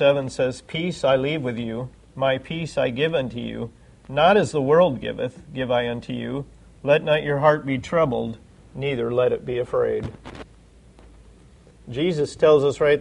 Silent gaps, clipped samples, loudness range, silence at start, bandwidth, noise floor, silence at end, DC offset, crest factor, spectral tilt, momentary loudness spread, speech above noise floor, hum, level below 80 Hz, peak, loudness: none; under 0.1%; 5 LU; 0 s; 11 kHz; -50 dBFS; 0 s; under 0.1%; 20 dB; -6 dB/octave; 15 LU; 29 dB; none; -50 dBFS; -4 dBFS; -22 LUFS